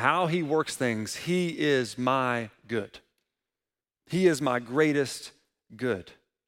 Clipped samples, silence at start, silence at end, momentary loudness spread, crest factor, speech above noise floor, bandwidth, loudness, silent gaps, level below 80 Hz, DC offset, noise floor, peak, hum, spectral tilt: under 0.1%; 0 s; 0.35 s; 9 LU; 22 dB; over 63 dB; 16.5 kHz; -28 LUFS; none; -68 dBFS; under 0.1%; under -90 dBFS; -8 dBFS; none; -5 dB/octave